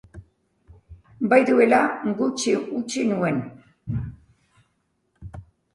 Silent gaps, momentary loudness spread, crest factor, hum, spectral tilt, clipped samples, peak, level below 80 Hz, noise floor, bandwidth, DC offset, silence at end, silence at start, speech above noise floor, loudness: none; 24 LU; 20 dB; none; -5.5 dB/octave; under 0.1%; -4 dBFS; -50 dBFS; -71 dBFS; 11.5 kHz; under 0.1%; 0.3 s; 0.15 s; 50 dB; -22 LUFS